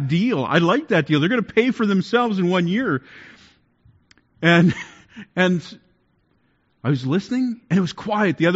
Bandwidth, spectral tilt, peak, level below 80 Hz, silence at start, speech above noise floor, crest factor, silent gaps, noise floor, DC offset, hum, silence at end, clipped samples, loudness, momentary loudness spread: 7.8 kHz; -5 dB/octave; -2 dBFS; -60 dBFS; 0 s; 45 dB; 18 dB; none; -64 dBFS; under 0.1%; none; 0 s; under 0.1%; -20 LUFS; 9 LU